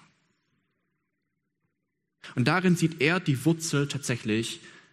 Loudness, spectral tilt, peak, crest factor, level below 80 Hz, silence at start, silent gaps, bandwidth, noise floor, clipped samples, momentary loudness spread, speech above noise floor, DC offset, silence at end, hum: -26 LUFS; -5 dB/octave; -6 dBFS; 22 dB; -66 dBFS; 2.25 s; none; 14.5 kHz; -81 dBFS; under 0.1%; 9 LU; 55 dB; under 0.1%; 0.2 s; none